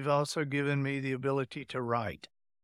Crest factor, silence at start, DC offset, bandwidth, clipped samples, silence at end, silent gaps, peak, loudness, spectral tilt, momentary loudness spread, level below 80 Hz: 18 dB; 0 s; under 0.1%; 13 kHz; under 0.1%; 0.35 s; none; -16 dBFS; -33 LUFS; -6 dB/octave; 7 LU; -68 dBFS